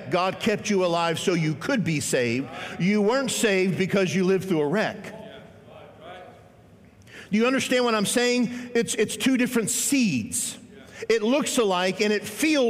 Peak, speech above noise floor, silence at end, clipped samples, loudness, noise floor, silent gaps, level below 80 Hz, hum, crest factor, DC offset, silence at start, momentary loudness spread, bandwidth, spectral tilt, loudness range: -10 dBFS; 28 dB; 0 s; under 0.1%; -23 LUFS; -52 dBFS; none; -64 dBFS; none; 14 dB; under 0.1%; 0 s; 12 LU; 16 kHz; -4 dB/octave; 5 LU